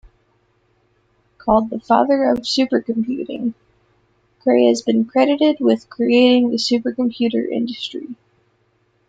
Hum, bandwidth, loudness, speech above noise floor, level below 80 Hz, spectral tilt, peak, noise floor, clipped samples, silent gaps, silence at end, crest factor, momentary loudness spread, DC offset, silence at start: none; 9 kHz; -18 LUFS; 46 dB; -54 dBFS; -5 dB/octave; -2 dBFS; -62 dBFS; under 0.1%; none; 0.95 s; 16 dB; 11 LU; under 0.1%; 1.45 s